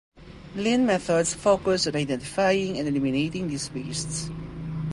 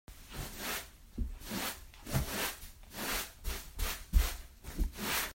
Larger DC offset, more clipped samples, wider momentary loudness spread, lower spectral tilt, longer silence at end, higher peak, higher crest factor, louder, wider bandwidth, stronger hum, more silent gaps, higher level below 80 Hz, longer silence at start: neither; neither; second, 10 LU vs 13 LU; first, -4.5 dB/octave vs -3 dB/octave; about the same, 0 s vs 0 s; first, -8 dBFS vs -14 dBFS; about the same, 18 dB vs 22 dB; first, -25 LUFS vs -38 LUFS; second, 11.5 kHz vs 16.5 kHz; neither; neither; second, -50 dBFS vs -40 dBFS; about the same, 0.15 s vs 0.1 s